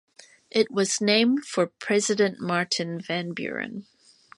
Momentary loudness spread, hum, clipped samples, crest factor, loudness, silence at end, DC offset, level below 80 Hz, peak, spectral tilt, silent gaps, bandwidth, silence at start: 10 LU; none; under 0.1%; 20 dB; -25 LUFS; 0.55 s; under 0.1%; -74 dBFS; -6 dBFS; -3.5 dB/octave; none; 11.5 kHz; 0.55 s